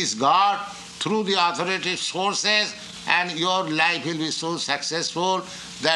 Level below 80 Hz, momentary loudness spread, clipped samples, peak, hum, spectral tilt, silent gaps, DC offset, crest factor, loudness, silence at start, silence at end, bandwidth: -66 dBFS; 8 LU; under 0.1%; -2 dBFS; none; -2.5 dB/octave; none; under 0.1%; 20 dB; -22 LUFS; 0 s; 0 s; 12 kHz